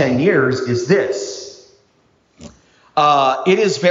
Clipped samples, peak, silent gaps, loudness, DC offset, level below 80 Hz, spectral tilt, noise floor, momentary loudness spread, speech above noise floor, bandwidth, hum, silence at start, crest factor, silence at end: under 0.1%; -2 dBFS; none; -16 LUFS; under 0.1%; -58 dBFS; -5 dB/octave; -58 dBFS; 13 LU; 43 dB; 7.6 kHz; none; 0 s; 16 dB; 0 s